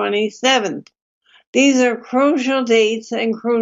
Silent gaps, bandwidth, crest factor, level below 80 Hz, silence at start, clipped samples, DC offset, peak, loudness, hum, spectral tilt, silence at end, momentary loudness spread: 1.02-1.21 s, 1.47-1.53 s; 7.8 kHz; 14 dB; -74 dBFS; 0 s; under 0.1%; under 0.1%; -2 dBFS; -17 LUFS; none; -3 dB/octave; 0 s; 7 LU